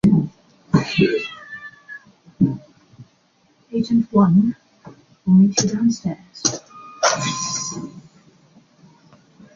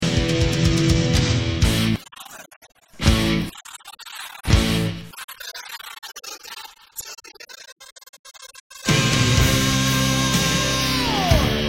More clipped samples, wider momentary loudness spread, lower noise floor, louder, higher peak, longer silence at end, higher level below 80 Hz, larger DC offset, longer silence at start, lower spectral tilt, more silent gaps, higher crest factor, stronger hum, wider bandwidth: neither; about the same, 21 LU vs 21 LU; first, -60 dBFS vs -42 dBFS; about the same, -19 LUFS vs -19 LUFS; about the same, -2 dBFS vs 0 dBFS; first, 1.55 s vs 0 s; second, -54 dBFS vs -30 dBFS; neither; about the same, 0.05 s vs 0 s; about the same, -5 dB/octave vs -4 dB/octave; second, none vs 2.56-2.61 s, 5.24-5.28 s, 7.72-7.76 s, 7.92-7.96 s, 8.09-8.13 s, 8.19-8.24 s, 8.60-8.70 s; about the same, 18 dB vs 20 dB; neither; second, 7.6 kHz vs 16.5 kHz